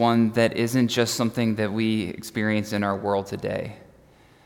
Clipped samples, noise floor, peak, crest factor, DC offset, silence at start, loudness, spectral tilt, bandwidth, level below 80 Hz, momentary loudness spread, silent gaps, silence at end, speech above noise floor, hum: under 0.1%; -54 dBFS; -8 dBFS; 16 dB; under 0.1%; 0 s; -24 LUFS; -5.5 dB/octave; 17.5 kHz; -60 dBFS; 8 LU; none; 0.65 s; 31 dB; none